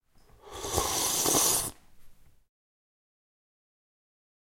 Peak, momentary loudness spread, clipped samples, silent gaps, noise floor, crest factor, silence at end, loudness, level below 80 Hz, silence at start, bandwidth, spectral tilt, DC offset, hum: -10 dBFS; 16 LU; under 0.1%; none; -55 dBFS; 22 dB; 2.35 s; -26 LUFS; -54 dBFS; 0.45 s; 16.5 kHz; -1.5 dB/octave; under 0.1%; none